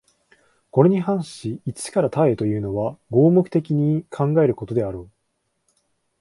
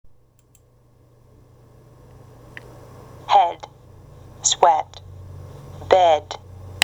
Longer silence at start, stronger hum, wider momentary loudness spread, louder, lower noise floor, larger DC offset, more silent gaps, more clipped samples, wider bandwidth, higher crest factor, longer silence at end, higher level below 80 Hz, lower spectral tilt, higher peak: second, 0.75 s vs 3.3 s; neither; second, 13 LU vs 26 LU; second, -21 LUFS vs -18 LUFS; first, -73 dBFS vs -56 dBFS; neither; neither; neither; second, 11.5 kHz vs 13 kHz; about the same, 20 dB vs 24 dB; first, 1.15 s vs 0.05 s; about the same, -54 dBFS vs -54 dBFS; first, -8 dB/octave vs -2 dB/octave; about the same, 0 dBFS vs 0 dBFS